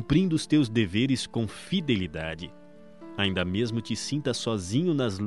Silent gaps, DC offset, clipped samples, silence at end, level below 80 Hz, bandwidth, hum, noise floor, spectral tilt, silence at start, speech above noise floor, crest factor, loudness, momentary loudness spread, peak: none; 0.3%; under 0.1%; 0 s; -52 dBFS; 11.5 kHz; none; -48 dBFS; -5.5 dB/octave; 0 s; 21 dB; 18 dB; -27 LUFS; 10 LU; -10 dBFS